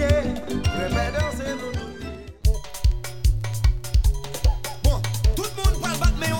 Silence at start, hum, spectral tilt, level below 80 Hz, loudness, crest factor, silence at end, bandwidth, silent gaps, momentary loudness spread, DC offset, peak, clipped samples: 0 s; none; -5 dB/octave; -24 dBFS; -25 LUFS; 16 dB; 0 s; 18.5 kHz; none; 6 LU; 2%; -6 dBFS; under 0.1%